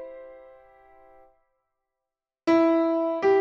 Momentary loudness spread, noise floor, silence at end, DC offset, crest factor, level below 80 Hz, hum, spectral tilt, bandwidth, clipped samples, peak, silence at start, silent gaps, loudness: 20 LU; -88 dBFS; 0 s; under 0.1%; 16 dB; -68 dBFS; none; -6 dB/octave; 6.8 kHz; under 0.1%; -10 dBFS; 0 s; none; -23 LUFS